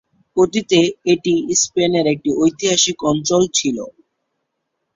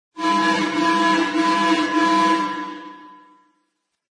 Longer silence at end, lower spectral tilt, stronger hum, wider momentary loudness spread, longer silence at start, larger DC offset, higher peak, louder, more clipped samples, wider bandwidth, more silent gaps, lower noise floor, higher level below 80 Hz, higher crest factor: about the same, 1.05 s vs 1 s; about the same, -3.5 dB/octave vs -3.5 dB/octave; neither; second, 5 LU vs 13 LU; first, 0.35 s vs 0.15 s; neither; first, -2 dBFS vs -6 dBFS; first, -16 LUFS vs -19 LUFS; neither; second, 7.8 kHz vs 10.5 kHz; neither; about the same, -74 dBFS vs -73 dBFS; first, -56 dBFS vs -70 dBFS; about the same, 16 dB vs 14 dB